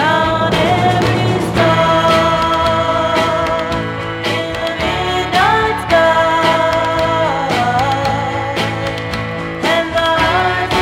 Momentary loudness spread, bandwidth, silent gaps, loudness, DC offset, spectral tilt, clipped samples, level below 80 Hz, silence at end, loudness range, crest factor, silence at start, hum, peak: 7 LU; 16.5 kHz; none; -14 LUFS; under 0.1%; -5 dB/octave; under 0.1%; -34 dBFS; 0 s; 3 LU; 14 dB; 0 s; none; 0 dBFS